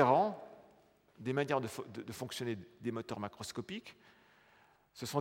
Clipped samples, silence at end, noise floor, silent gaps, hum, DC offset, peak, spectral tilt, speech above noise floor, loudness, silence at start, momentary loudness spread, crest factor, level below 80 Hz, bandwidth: under 0.1%; 0 s; -67 dBFS; none; none; under 0.1%; -14 dBFS; -5.5 dB/octave; 27 dB; -39 LUFS; 0 s; 17 LU; 24 dB; -78 dBFS; 16.5 kHz